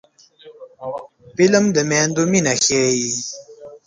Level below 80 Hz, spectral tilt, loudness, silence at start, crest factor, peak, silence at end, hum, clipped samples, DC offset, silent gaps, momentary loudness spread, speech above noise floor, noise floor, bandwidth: -58 dBFS; -3.5 dB/octave; -16 LUFS; 0.45 s; 18 dB; -2 dBFS; 0.1 s; none; under 0.1%; under 0.1%; none; 18 LU; 29 dB; -46 dBFS; 10 kHz